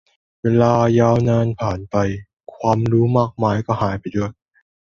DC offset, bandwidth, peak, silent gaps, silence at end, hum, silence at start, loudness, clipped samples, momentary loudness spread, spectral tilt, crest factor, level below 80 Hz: under 0.1%; 7 kHz; -2 dBFS; 2.33-2.37 s; 0.55 s; none; 0.45 s; -18 LUFS; under 0.1%; 10 LU; -8 dB/octave; 16 dB; -44 dBFS